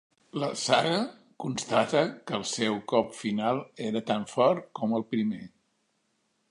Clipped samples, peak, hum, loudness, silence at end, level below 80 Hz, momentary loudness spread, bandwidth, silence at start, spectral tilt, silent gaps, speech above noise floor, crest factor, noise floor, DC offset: under 0.1%; -6 dBFS; none; -28 LUFS; 1.05 s; -72 dBFS; 9 LU; 11.5 kHz; 0.35 s; -4.5 dB/octave; none; 46 dB; 24 dB; -74 dBFS; under 0.1%